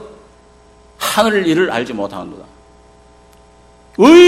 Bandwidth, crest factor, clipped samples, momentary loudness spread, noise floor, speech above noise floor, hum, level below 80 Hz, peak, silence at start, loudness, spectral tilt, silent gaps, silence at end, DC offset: 16 kHz; 14 dB; 0.4%; 19 LU; -46 dBFS; 35 dB; 60 Hz at -50 dBFS; -50 dBFS; 0 dBFS; 0 s; -14 LUFS; -4.5 dB/octave; none; 0 s; under 0.1%